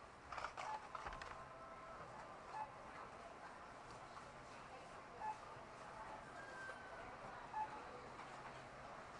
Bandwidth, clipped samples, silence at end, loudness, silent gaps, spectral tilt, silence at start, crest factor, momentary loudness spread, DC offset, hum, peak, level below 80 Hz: 11 kHz; under 0.1%; 0 s; -53 LUFS; none; -4 dB/octave; 0 s; 22 dB; 7 LU; under 0.1%; none; -32 dBFS; -72 dBFS